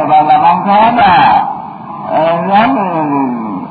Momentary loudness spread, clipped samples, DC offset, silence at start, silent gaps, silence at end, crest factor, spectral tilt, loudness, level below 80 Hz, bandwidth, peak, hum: 12 LU; under 0.1%; under 0.1%; 0 s; none; 0 s; 10 dB; -9 dB/octave; -10 LUFS; -46 dBFS; 4.9 kHz; 0 dBFS; none